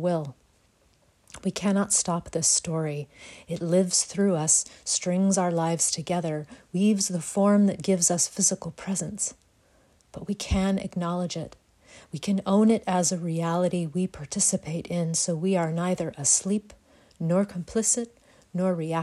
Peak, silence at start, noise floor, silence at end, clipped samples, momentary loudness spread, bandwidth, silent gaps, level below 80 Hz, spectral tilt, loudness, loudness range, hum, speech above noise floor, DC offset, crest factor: -8 dBFS; 0 s; -64 dBFS; 0 s; under 0.1%; 12 LU; 13.5 kHz; none; -50 dBFS; -4.5 dB/octave; -25 LUFS; 4 LU; none; 38 dB; under 0.1%; 18 dB